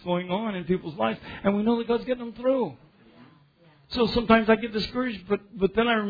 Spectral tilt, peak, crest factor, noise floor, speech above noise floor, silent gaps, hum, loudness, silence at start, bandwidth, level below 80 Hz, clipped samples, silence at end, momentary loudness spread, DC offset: -7.5 dB/octave; -4 dBFS; 22 dB; -58 dBFS; 33 dB; none; none; -26 LUFS; 0.05 s; 5 kHz; -50 dBFS; under 0.1%; 0 s; 10 LU; under 0.1%